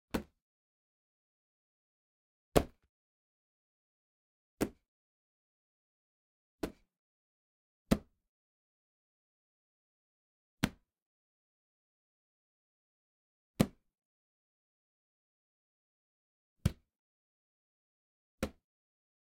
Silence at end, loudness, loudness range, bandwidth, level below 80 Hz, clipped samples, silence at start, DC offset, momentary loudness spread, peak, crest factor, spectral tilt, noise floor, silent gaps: 0.8 s; -38 LUFS; 6 LU; 15.5 kHz; -56 dBFS; under 0.1%; 0.15 s; under 0.1%; 11 LU; -8 dBFS; 36 dB; -6 dB/octave; under -90 dBFS; 0.42-2.52 s, 2.89-4.57 s, 4.88-6.59 s, 6.99-7.85 s, 8.29-10.57 s, 11.02-13.54 s, 14.05-16.56 s, 16.99-18.38 s